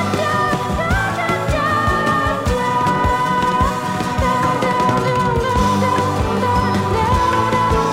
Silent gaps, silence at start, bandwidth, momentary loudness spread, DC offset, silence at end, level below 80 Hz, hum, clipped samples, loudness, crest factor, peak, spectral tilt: none; 0 s; 16.5 kHz; 3 LU; under 0.1%; 0 s; -30 dBFS; none; under 0.1%; -17 LUFS; 14 dB; -4 dBFS; -5.5 dB/octave